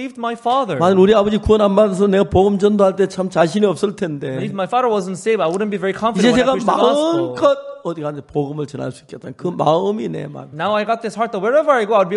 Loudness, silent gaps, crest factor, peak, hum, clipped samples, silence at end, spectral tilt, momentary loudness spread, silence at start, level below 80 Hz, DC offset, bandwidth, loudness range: -17 LUFS; none; 16 dB; 0 dBFS; none; under 0.1%; 0 s; -6 dB/octave; 12 LU; 0 s; -42 dBFS; under 0.1%; 11.5 kHz; 7 LU